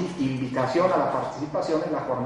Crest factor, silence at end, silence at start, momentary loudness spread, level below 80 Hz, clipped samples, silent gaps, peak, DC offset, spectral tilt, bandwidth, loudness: 18 dB; 0 s; 0 s; 7 LU; -58 dBFS; under 0.1%; none; -8 dBFS; under 0.1%; -7 dB/octave; 11 kHz; -25 LUFS